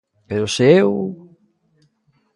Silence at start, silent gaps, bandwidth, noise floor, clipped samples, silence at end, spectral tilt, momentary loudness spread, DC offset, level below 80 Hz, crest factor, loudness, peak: 0.3 s; none; 11.5 kHz; -63 dBFS; under 0.1%; 1.2 s; -5.5 dB/octave; 14 LU; under 0.1%; -54 dBFS; 20 dB; -17 LUFS; 0 dBFS